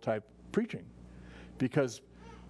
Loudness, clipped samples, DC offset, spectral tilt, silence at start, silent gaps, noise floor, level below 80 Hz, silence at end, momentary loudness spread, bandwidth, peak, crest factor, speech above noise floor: -35 LUFS; under 0.1%; under 0.1%; -6.5 dB/octave; 0 s; none; -51 dBFS; -60 dBFS; 0 s; 21 LU; 11 kHz; -16 dBFS; 22 dB; 18 dB